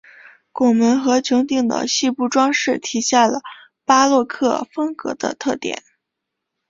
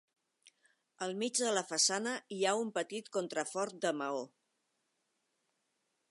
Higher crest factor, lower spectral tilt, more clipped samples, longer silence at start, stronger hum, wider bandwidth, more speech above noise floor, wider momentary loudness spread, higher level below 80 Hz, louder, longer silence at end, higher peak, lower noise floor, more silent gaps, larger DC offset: about the same, 18 dB vs 22 dB; about the same, -3 dB/octave vs -2 dB/octave; neither; second, 0.55 s vs 1 s; neither; second, 7.8 kHz vs 11.5 kHz; first, 62 dB vs 47 dB; about the same, 11 LU vs 10 LU; first, -62 dBFS vs under -90 dBFS; first, -18 LUFS vs -35 LUFS; second, 0.9 s vs 1.85 s; first, -2 dBFS vs -16 dBFS; about the same, -80 dBFS vs -82 dBFS; neither; neither